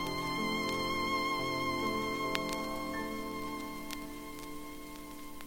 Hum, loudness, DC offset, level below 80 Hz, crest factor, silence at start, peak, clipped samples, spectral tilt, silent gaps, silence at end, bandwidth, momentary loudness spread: none; -35 LUFS; under 0.1%; -54 dBFS; 28 dB; 0 s; -8 dBFS; under 0.1%; -4 dB/octave; none; 0 s; 17 kHz; 13 LU